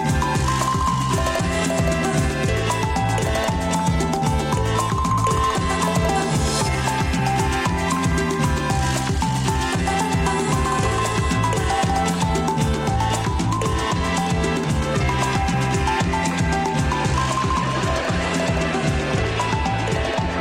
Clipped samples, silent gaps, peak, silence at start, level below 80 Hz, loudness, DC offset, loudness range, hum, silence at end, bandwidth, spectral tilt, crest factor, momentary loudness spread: under 0.1%; none; -10 dBFS; 0 s; -30 dBFS; -21 LUFS; under 0.1%; 1 LU; none; 0 s; 16.5 kHz; -5 dB/octave; 10 dB; 1 LU